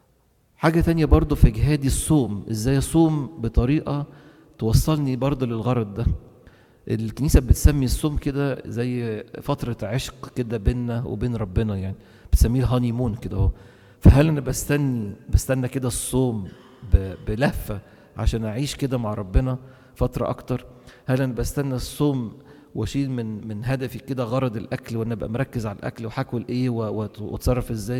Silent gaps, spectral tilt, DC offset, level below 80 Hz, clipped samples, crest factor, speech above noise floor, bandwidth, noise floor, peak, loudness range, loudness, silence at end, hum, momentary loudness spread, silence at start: none; -6.5 dB/octave; under 0.1%; -28 dBFS; under 0.1%; 20 dB; 40 dB; 17 kHz; -62 dBFS; -2 dBFS; 6 LU; -23 LUFS; 0 s; none; 12 LU; 0.6 s